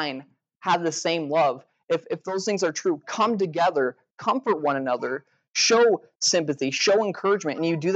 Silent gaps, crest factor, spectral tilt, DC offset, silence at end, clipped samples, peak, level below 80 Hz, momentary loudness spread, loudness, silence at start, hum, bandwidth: 0.56-0.61 s, 1.84-1.88 s, 4.11-4.18 s, 5.50-5.54 s, 6.16-6.20 s; 14 dB; -3 dB/octave; under 0.1%; 0 s; under 0.1%; -10 dBFS; -86 dBFS; 9 LU; -24 LUFS; 0 s; none; 9 kHz